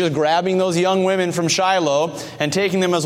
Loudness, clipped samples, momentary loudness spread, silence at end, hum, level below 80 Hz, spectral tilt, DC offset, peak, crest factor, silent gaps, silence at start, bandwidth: -18 LUFS; under 0.1%; 4 LU; 0 s; none; -62 dBFS; -4.5 dB/octave; under 0.1%; -4 dBFS; 14 dB; none; 0 s; 15.5 kHz